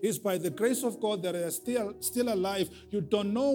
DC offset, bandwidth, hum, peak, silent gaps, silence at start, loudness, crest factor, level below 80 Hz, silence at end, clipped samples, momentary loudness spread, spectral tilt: under 0.1%; 19 kHz; none; -14 dBFS; none; 0 s; -31 LUFS; 16 dB; -66 dBFS; 0 s; under 0.1%; 4 LU; -4.5 dB/octave